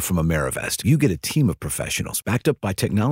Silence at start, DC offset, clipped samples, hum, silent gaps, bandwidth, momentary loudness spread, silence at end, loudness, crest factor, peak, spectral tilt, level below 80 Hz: 0 s; under 0.1%; under 0.1%; none; none; 16.5 kHz; 5 LU; 0 s; -22 LUFS; 16 dB; -6 dBFS; -5 dB/octave; -40 dBFS